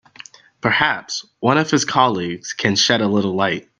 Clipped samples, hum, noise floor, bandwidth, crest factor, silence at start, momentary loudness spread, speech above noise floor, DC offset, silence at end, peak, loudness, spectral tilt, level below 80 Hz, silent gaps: under 0.1%; none; -43 dBFS; 10.5 kHz; 18 dB; 0.65 s; 9 LU; 25 dB; under 0.1%; 0.2 s; 0 dBFS; -18 LUFS; -3.5 dB/octave; -58 dBFS; none